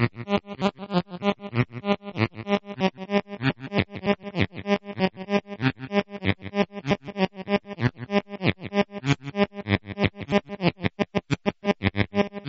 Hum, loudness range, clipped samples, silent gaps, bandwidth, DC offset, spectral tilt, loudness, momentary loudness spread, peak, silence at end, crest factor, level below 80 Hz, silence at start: none; 1 LU; under 0.1%; none; 7.6 kHz; under 0.1%; -5 dB/octave; -27 LUFS; 3 LU; -4 dBFS; 0 s; 22 dB; -52 dBFS; 0 s